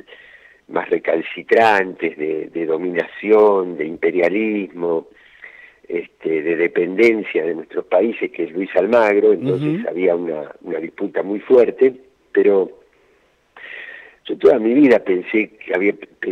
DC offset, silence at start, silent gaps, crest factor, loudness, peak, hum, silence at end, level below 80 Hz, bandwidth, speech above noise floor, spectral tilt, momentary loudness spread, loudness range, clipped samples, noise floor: under 0.1%; 0.7 s; none; 16 dB; -18 LUFS; -2 dBFS; none; 0 s; -64 dBFS; 7.8 kHz; 41 dB; -7.5 dB/octave; 14 LU; 3 LU; under 0.1%; -58 dBFS